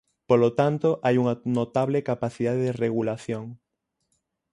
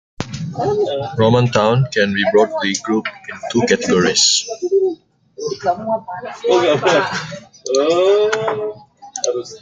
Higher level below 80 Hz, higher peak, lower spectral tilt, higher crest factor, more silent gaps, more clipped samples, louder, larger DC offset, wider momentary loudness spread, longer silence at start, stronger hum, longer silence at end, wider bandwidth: second, -62 dBFS vs -52 dBFS; second, -6 dBFS vs 0 dBFS; first, -8 dB/octave vs -4 dB/octave; about the same, 20 dB vs 16 dB; neither; neither; second, -25 LUFS vs -16 LUFS; neither; second, 9 LU vs 14 LU; about the same, 0.3 s vs 0.2 s; neither; first, 0.95 s vs 0.05 s; first, 11 kHz vs 9.6 kHz